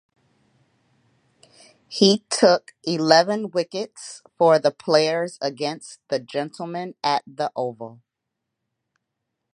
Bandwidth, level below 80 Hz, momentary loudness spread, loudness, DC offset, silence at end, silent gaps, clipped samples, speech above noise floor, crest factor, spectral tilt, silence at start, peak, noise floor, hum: 11.5 kHz; -76 dBFS; 16 LU; -21 LUFS; under 0.1%; 1.6 s; none; under 0.1%; 60 dB; 24 dB; -4 dB/octave; 1.9 s; 0 dBFS; -82 dBFS; none